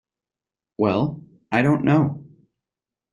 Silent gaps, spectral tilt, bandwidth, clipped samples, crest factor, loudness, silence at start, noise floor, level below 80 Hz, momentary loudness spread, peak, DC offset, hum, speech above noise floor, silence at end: none; -8.5 dB/octave; 10 kHz; under 0.1%; 20 dB; -21 LUFS; 0.8 s; -90 dBFS; -58 dBFS; 14 LU; -4 dBFS; under 0.1%; none; 71 dB; 0.9 s